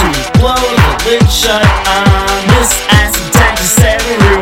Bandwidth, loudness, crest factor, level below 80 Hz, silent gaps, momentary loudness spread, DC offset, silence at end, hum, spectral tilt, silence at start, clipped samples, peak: 18.5 kHz; -9 LUFS; 8 dB; -16 dBFS; none; 2 LU; under 0.1%; 0 s; none; -4 dB/octave; 0 s; 1%; 0 dBFS